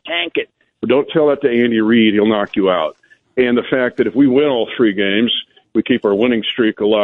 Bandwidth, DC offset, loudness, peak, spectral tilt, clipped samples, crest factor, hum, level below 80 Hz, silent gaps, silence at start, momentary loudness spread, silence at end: 4.1 kHz; under 0.1%; -15 LUFS; -2 dBFS; -8 dB/octave; under 0.1%; 12 dB; none; -56 dBFS; none; 0.05 s; 8 LU; 0 s